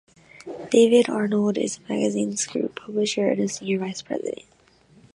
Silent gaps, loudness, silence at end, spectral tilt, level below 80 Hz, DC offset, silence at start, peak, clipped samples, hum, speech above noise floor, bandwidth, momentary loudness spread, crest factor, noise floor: none; -23 LUFS; 0.8 s; -4.5 dB/octave; -68 dBFS; under 0.1%; 0.35 s; -6 dBFS; under 0.1%; none; 33 dB; 11.5 kHz; 15 LU; 18 dB; -56 dBFS